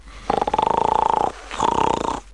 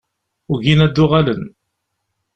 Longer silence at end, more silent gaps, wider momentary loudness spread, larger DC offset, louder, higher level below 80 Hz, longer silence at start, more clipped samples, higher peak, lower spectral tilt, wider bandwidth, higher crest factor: second, 0 s vs 0.9 s; neither; second, 6 LU vs 13 LU; first, 0.3% vs under 0.1%; second, -21 LUFS vs -15 LUFS; about the same, -42 dBFS vs -40 dBFS; second, 0.05 s vs 0.5 s; neither; about the same, -4 dBFS vs -2 dBFS; second, -4.5 dB/octave vs -7.5 dB/octave; first, 11 kHz vs 8 kHz; about the same, 18 dB vs 16 dB